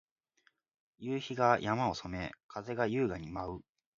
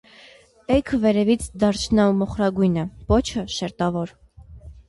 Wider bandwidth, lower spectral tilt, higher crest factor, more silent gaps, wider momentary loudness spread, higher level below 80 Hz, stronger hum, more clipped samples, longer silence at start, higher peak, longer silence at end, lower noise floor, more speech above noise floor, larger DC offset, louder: second, 7.4 kHz vs 11.5 kHz; about the same, -5 dB/octave vs -6 dB/octave; first, 24 dB vs 16 dB; first, 2.44-2.49 s vs none; first, 14 LU vs 9 LU; second, -60 dBFS vs -38 dBFS; neither; neither; first, 1 s vs 0.7 s; second, -12 dBFS vs -6 dBFS; first, 0.35 s vs 0.1 s; first, -74 dBFS vs -50 dBFS; first, 40 dB vs 29 dB; neither; second, -34 LUFS vs -21 LUFS